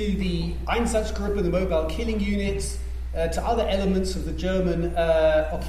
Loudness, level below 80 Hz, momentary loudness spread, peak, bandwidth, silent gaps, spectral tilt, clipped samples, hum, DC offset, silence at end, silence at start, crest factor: -25 LUFS; -30 dBFS; 8 LU; -8 dBFS; 15 kHz; none; -6 dB/octave; under 0.1%; none; under 0.1%; 0 s; 0 s; 16 dB